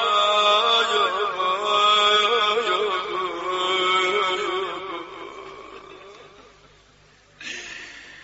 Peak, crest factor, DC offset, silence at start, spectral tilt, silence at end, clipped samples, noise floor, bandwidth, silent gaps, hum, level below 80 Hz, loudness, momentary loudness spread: -6 dBFS; 18 dB; under 0.1%; 0 s; 2 dB/octave; 0 s; under 0.1%; -54 dBFS; 8 kHz; none; 50 Hz at -60 dBFS; -62 dBFS; -20 LUFS; 21 LU